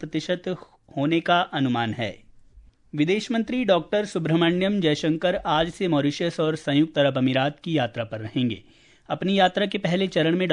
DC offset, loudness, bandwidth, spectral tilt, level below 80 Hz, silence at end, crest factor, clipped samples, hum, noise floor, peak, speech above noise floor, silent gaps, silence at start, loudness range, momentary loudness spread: under 0.1%; -24 LUFS; 10.5 kHz; -6 dB/octave; -56 dBFS; 0 s; 18 dB; under 0.1%; none; -52 dBFS; -6 dBFS; 29 dB; none; 0 s; 2 LU; 8 LU